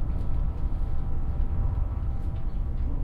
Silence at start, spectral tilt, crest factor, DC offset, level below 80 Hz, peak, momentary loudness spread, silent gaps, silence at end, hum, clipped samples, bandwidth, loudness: 0 s; -10 dB/octave; 12 dB; under 0.1%; -28 dBFS; -14 dBFS; 3 LU; none; 0 s; none; under 0.1%; 3 kHz; -32 LUFS